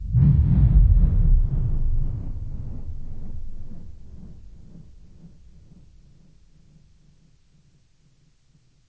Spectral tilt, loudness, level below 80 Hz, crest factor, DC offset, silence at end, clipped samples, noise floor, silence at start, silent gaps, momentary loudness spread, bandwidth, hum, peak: -11.5 dB/octave; -22 LUFS; -24 dBFS; 18 dB; under 0.1%; 3.6 s; under 0.1%; -58 dBFS; 0 s; none; 27 LU; 2 kHz; none; -4 dBFS